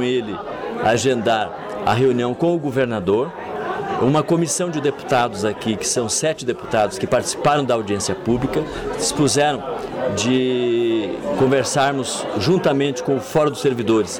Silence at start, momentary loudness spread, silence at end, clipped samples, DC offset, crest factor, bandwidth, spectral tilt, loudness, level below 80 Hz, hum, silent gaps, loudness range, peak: 0 s; 7 LU; 0 s; under 0.1%; under 0.1%; 12 dB; 17.5 kHz; -4.5 dB/octave; -20 LUFS; -48 dBFS; none; none; 1 LU; -8 dBFS